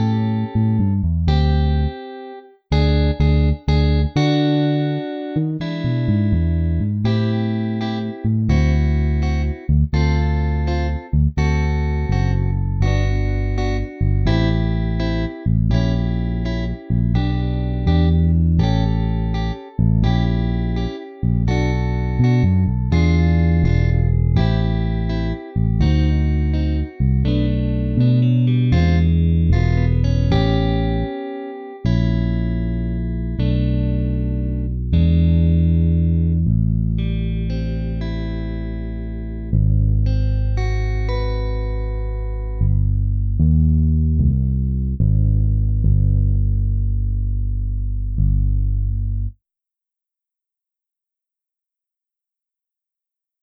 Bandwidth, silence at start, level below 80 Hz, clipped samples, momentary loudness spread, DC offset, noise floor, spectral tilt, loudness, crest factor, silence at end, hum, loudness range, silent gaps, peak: 6.4 kHz; 0 s; -22 dBFS; under 0.1%; 8 LU; under 0.1%; -87 dBFS; -8.5 dB/octave; -19 LUFS; 10 dB; 4.1 s; none; 4 LU; none; -6 dBFS